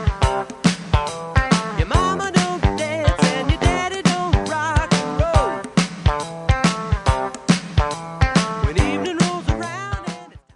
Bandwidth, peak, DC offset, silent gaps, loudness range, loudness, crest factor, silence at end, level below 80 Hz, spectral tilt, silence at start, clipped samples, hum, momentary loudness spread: 11.5 kHz; -2 dBFS; under 0.1%; none; 1 LU; -20 LUFS; 18 dB; 0.15 s; -26 dBFS; -5.5 dB/octave; 0 s; under 0.1%; none; 5 LU